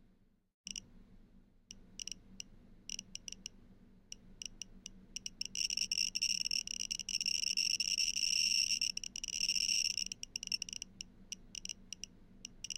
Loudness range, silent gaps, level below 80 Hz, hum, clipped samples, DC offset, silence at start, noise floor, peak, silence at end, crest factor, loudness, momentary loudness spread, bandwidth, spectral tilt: 16 LU; none; -62 dBFS; none; under 0.1%; under 0.1%; 0.65 s; -69 dBFS; -20 dBFS; 0 s; 20 dB; -35 LUFS; 20 LU; 16.5 kHz; 1.5 dB/octave